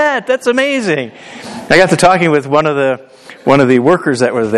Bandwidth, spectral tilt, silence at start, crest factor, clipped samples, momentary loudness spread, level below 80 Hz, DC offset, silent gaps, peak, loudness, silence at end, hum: 12.5 kHz; -5 dB/octave; 0 s; 12 dB; 0.3%; 14 LU; -48 dBFS; under 0.1%; none; 0 dBFS; -11 LUFS; 0 s; none